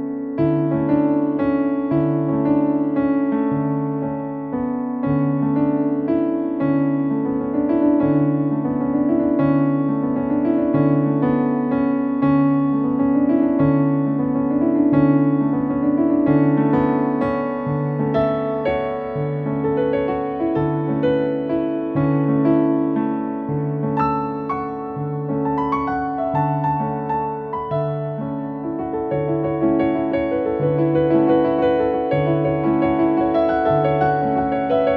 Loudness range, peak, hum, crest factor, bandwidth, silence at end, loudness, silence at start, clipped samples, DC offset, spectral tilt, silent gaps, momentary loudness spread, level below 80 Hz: 5 LU; -4 dBFS; none; 14 dB; 4.5 kHz; 0 s; -19 LUFS; 0 s; under 0.1%; under 0.1%; -11.5 dB/octave; none; 7 LU; -48 dBFS